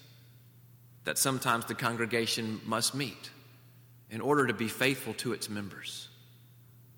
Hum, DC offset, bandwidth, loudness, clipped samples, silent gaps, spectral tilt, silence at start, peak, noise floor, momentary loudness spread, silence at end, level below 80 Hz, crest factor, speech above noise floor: none; under 0.1%; over 20 kHz; -31 LUFS; under 0.1%; none; -3.5 dB/octave; 0 s; -12 dBFS; -57 dBFS; 14 LU; 0.15 s; -74 dBFS; 22 dB; 25 dB